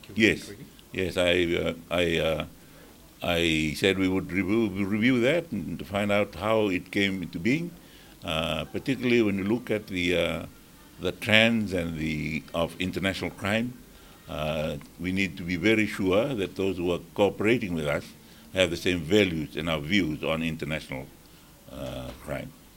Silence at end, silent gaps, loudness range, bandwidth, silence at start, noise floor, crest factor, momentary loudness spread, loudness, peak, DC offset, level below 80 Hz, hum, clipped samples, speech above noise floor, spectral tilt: 0.25 s; none; 3 LU; 17 kHz; 0 s; -52 dBFS; 26 dB; 13 LU; -27 LUFS; -2 dBFS; under 0.1%; -50 dBFS; none; under 0.1%; 26 dB; -5.5 dB/octave